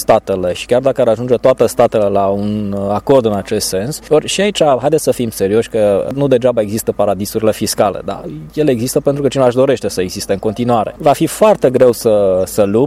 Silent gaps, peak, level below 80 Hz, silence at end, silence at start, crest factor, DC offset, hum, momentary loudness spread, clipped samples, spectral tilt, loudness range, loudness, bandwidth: none; 0 dBFS; -42 dBFS; 0 s; 0 s; 12 dB; under 0.1%; none; 6 LU; under 0.1%; -5 dB/octave; 2 LU; -14 LUFS; 16 kHz